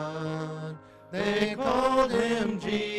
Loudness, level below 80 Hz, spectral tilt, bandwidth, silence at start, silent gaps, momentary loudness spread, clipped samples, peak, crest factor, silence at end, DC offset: -27 LUFS; -54 dBFS; -5.5 dB/octave; 13.5 kHz; 0 s; none; 14 LU; under 0.1%; -12 dBFS; 16 dB; 0 s; under 0.1%